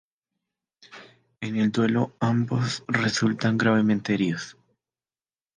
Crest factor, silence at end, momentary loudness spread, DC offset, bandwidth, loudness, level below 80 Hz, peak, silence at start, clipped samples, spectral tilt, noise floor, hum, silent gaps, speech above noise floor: 18 dB; 1.05 s; 9 LU; under 0.1%; 9.6 kHz; -24 LUFS; -64 dBFS; -8 dBFS; 0.9 s; under 0.1%; -6 dB/octave; under -90 dBFS; none; none; over 67 dB